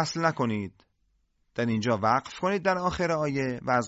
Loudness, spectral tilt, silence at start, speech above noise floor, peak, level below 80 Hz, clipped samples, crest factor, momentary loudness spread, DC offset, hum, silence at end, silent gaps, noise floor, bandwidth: -27 LUFS; -5.5 dB/octave; 0 s; 44 dB; -10 dBFS; -54 dBFS; under 0.1%; 18 dB; 7 LU; under 0.1%; none; 0 s; none; -71 dBFS; 8 kHz